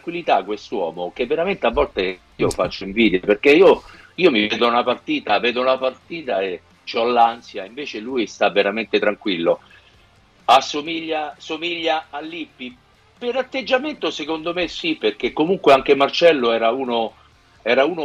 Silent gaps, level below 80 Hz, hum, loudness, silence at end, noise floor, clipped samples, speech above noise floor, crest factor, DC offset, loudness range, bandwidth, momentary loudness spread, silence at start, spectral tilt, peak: none; -48 dBFS; none; -19 LUFS; 0 s; -53 dBFS; under 0.1%; 34 dB; 16 dB; under 0.1%; 7 LU; 12.5 kHz; 14 LU; 0.05 s; -4.5 dB/octave; -4 dBFS